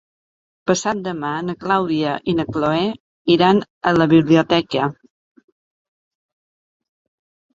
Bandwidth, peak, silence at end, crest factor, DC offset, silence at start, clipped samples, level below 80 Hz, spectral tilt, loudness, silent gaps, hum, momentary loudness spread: 7.8 kHz; -2 dBFS; 2.65 s; 18 dB; under 0.1%; 0.65 s; under 0.1%; -54 dBFS; -5.5 dB/octave; -18 LUFS; 3.00-3.25 s, 3.70-3.81 s; none; 10 LU